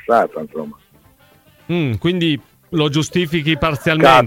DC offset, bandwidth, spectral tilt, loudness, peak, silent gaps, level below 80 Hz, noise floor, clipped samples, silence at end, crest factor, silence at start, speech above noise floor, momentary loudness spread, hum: under 0.1%; 17 kHz; -5.5 dB/octave; -17 LUFS; -2 dBFS; none; -44 dBFS; -51 dBFS; under 0.1%; 0 s; 16 dB; 0.1 s; 35 dB; 12 LU; none